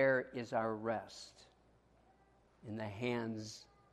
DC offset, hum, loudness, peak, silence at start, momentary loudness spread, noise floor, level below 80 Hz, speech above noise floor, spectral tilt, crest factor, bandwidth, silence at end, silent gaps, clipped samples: under 0.1%; none; -40 LUFS; -20 dBFS; 0 s; 16 LU; -70 dBFS; -74 dBFS; 30 dB; -5.5 dB/octave; 20 dB; 12 kHz; 0.3 s; none; under 0.1%